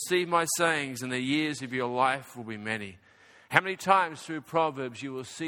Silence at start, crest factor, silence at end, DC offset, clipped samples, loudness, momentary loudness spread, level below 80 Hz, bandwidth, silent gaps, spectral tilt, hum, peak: 0 s; 28 dB; 0 s; under 0.1%; under 0.1%; -28 LUFS; 13 LU; -72 dBFS; 17.5 kHz; none; -3.5 dB/octave; none; -2 dBFS